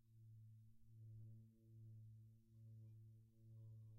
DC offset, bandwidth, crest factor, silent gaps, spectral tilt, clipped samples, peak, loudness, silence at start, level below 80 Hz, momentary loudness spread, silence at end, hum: under 0.1%; 1.1 kHz; 10 dB; none; -16.5 dB/octave; under 0.1%; -52 dBFS; -65 LUFS; 0 s; -82 dBFS; 6 LU; 0 s; none